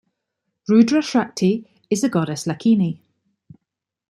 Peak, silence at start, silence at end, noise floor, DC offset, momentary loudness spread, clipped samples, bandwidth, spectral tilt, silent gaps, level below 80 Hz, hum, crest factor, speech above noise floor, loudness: -4 dBFS; 0.7 s; 1.15 s; -82 dBFS; under 0.1%; 11 LU; under 0.1%; 12.5 kHz; -6 dB/octave; none; -64 dBFS; none; 18 dB; 65 dB; -19 LUFS